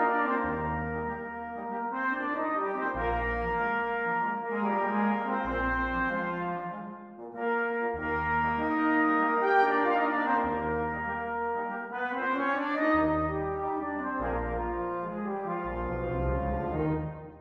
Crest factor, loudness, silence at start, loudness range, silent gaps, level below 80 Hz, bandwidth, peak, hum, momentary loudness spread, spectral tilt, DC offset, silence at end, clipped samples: 18 dB; -30 LUFS; 0 s; 5 LU; none; -44 dBFS; 6.4 kHz; -12 dBFS; none; 9 LU; -8.5 dB/octave; under 0.1%; 0 s; under 0.1%